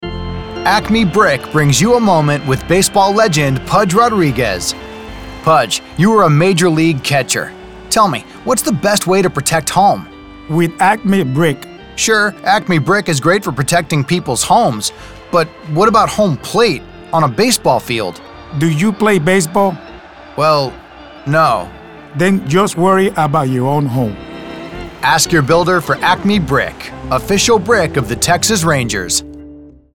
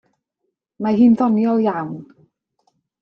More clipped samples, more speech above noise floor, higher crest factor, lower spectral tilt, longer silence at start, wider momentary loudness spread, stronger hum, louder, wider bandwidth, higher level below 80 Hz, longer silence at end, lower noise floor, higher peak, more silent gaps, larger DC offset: neither; second, 24 dB vs 60 dB; about the same, 14 dB vs 16 dB; second, -4.5 dB/octave vs -9.5 dB/octave; second, 0 s vs 0.8 s; about the same, 13 LU vs 15 LU; neither; first, -13 LUFS vs -17 LUFS; first, 17.5 kHz vs 5.8 kHz; first, -38 dBFS vs -60 dBFS; second, 0.25 s vs 1 s; second, -36 dBFS vs -76 dBFS; first, 0 dBFS vs -4 dBFS; neither; first, 0.5% vs under 0.1%